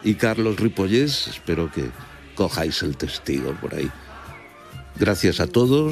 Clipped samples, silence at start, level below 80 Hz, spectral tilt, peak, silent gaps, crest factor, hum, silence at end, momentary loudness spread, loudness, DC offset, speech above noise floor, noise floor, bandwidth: under 0.1%; 0 s; -44 dBFS; -5.5 dB/octave; -4 dBFS; none; 18 dB; none; 0 s; 20 LU; -22 LUFS; under 0.1%; 20 dB; -41 dBFS; 15 kHz